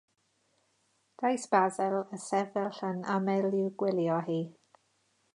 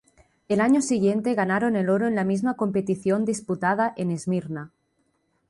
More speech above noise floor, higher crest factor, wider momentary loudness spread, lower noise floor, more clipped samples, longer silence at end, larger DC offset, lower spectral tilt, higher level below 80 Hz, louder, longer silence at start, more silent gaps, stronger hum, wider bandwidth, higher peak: second, 43 dB vs 47 dB; first, 22 dB vs 14 dB; about the same, 7 LU vs 8 LU; about the same, -73 dBFS vs -70 dBFS; neither; about the same, 0.85 s vs 0.8 s; neither; about the same, -6 dB/octave vs -6.5 dB/octave; second, -86 dBFS vs -64 dBFS; second, -31 LUFS vs -24 LUFS; first, 1.2 s vs 0.5 s; neither; neither; about the same, 11 kHz vs 11.5 kHz; about the same, -10 dBFS vs -10 dBFS